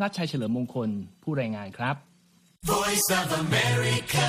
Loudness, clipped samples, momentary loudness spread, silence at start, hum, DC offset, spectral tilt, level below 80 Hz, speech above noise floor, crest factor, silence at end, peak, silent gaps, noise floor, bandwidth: -27 LUFS; under 0.1%; 10 LU; 0 s; none; under 0.1%; -4 dB/octave; -54 dBFS; 35 dB; 16 dB; 0 s; -10 dBFS; none; -61 dBFS; 15.5 kHz